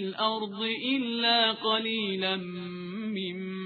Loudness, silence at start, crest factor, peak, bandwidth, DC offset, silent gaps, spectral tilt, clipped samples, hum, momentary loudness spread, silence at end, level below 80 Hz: -28 LUFS; 0 s; 18 dB; -12 dBFS; 4.8 kHz; under 0.1%; none; -7 dB/octave; under 0.1%; none; 12 LU; 0 s; -76 dBFS